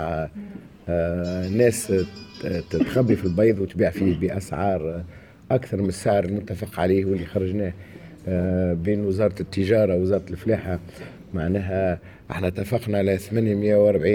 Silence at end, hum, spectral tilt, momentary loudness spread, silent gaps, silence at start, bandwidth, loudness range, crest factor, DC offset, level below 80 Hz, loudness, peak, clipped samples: 0 s; none; -7 dB/octave; 13 LU; none; 0 s; 17.5 kHz; 3 LU; 18 dB; under 0.1%; -50 dBFS; -23 LUFS; -6 dBFS; under 0.1%